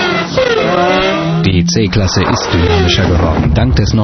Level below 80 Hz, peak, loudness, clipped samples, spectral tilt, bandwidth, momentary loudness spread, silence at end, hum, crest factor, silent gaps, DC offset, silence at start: -22 dBFS; 0 dBFS; -11 LUFS; under 0.1%; -5.5 dB/octave; 6.4 kHz; 2 LU; 0 s; none; 10 dB; none; under 0.1%; 0 s